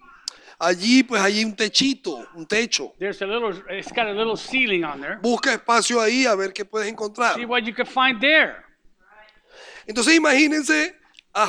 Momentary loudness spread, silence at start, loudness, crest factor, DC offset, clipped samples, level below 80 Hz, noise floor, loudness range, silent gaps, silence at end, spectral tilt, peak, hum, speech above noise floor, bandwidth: 13 LU; 0.45 s; -20 LUFS; 20 dB; under 0.1%; under 0.1%; -60 dBFS; -54 dBFS; 4 LU; none; 0 s; -2.5 dB/octave; -2 dBFS; none; 33 dB; 12.5 kHz